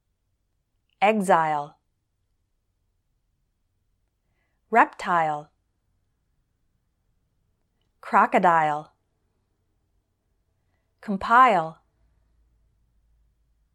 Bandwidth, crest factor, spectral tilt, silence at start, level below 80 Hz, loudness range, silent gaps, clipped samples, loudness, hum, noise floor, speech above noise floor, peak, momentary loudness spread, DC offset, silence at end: 13 kHz; 24 dB; -5.5 dB/octave; 1 s; -66 dBFS; 4 LU; none; under 0.1%; -21 LUFS; none; -74 dBFS; 53 dB; -4 dBFS; 16 LU; under 0.1%; 2.05 s